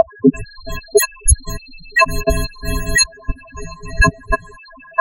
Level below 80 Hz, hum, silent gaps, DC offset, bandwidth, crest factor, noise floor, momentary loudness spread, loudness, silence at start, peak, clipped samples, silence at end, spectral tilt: -24 dBFS; none; none; under 0.1%; 16 kHz; 18 dB; -40 dBFS; 17 LU; -17 LUFS; 0 s; 0 dBFS; under 0.1%; 0 s; -3.5 dB/octave